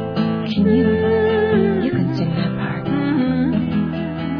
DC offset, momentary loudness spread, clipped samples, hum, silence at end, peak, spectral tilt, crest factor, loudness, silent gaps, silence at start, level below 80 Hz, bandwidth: under 0.1%; 6 LU; under 0.1%; none; 0 s; -4 dBFS; -9.5 dB/octave; 14 dB; -18 LUFS; none; 0 s; -44 dBFS; 5.4 kHz